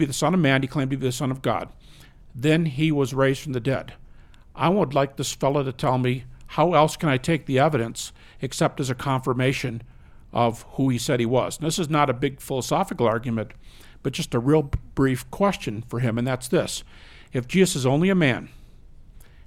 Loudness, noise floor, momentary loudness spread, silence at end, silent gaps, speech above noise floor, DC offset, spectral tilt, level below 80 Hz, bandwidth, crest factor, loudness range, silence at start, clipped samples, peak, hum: -23 LUFS; -47 dBFS; 10 LU; 0.05 s; none; 24 dB; under 0.1%; -5.5 dB/octave; -46 dBFS; 16.5 kHz; 20 dB; 2 LU; 0 s; under 0.1%; -4 dBFS; none